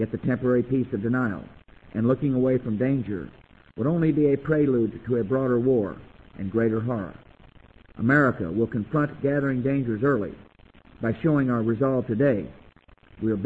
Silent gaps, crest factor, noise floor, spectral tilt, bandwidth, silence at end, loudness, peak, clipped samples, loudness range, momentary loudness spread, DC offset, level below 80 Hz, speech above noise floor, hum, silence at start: none; 18 dB; -54 dBFS; -11 dB/octave; 4.2 kHz; 0 s; -24 LUFS; -8 dBFS; under 0.1%; 2 LU; 11 LU; under 0.1%; -52 dBFS; 30 dB; none; 0 s